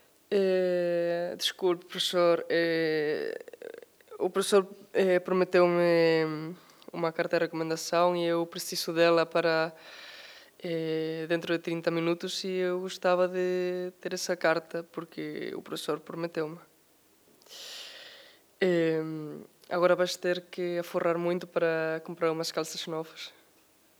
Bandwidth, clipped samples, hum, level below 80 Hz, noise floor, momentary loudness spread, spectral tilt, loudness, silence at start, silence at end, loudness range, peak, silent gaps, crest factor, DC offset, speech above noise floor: over 20 kHz; under 0.1%; none; -86 dBFS; -64 dBFS; 17 LU; -4.5 dB/octave; -29 LUFS; 0.3 s; 0.7 s; 7 LU; -10 dBFS; none; 18 dB; under 0.1%; 35 dB